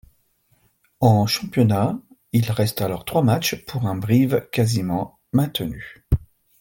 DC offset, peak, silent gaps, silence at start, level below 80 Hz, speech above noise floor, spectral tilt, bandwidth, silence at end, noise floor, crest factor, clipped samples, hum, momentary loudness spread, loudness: under 0.1%; -4 dBFS; none; 1 s; -40 dBFS; 43 dB; -6 dB/octave; 17 kHz; 0.35 s; -63 dBFS; 18 dB; under 0.1%; none; 8 LU; -21 LUFS